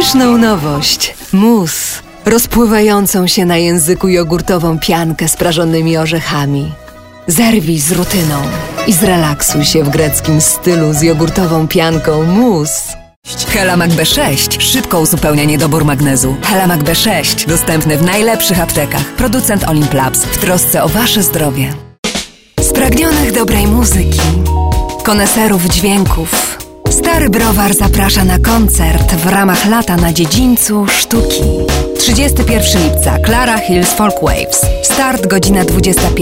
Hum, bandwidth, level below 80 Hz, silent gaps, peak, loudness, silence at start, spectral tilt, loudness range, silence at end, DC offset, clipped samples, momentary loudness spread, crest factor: none; 16.5 kHz; -20 dBFS; 13.16-13.22 s, 21.98-22.03 s; 0 dBFS; -10 LUFS; 0 s; -4 dB/octave; 2 LU; 0 s; under 0.1%; under 0.1%; 5 LU; 10 dB